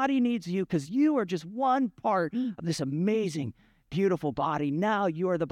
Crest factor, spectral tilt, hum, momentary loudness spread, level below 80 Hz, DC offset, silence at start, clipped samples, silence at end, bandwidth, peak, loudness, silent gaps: 14 dB; -6.5 dB/octave; none; 6 LU; -64 dBFS; under 0.1%; 0 s; under 0.1%; 0 s; 13.5 kHz; -14 dBFS; -29 LUFS; none